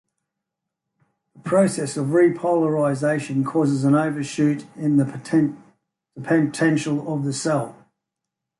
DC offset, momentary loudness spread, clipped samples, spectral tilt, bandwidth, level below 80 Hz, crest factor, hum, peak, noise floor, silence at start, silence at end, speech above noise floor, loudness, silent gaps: under 0.1%; 7 LU; under 0.1%; -6.5 dB/octave; 11.5 kHz; -66 dBFS; 16 dB; none; -6 dBFS; -84 dBFS; 1.45 s; 0.9 s; 63 dB; -21 LUFS; none